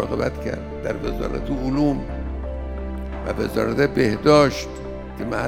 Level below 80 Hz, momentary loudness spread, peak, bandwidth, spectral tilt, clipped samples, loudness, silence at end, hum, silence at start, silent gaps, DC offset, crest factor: -32 dBFS; 15 LU; -2 dBFS; 16.5 kHz; -6.5 dB/octave; under 0.1%; -23 LUFS; 0 s; none; 0 s; none; under 0.1%; 20 dB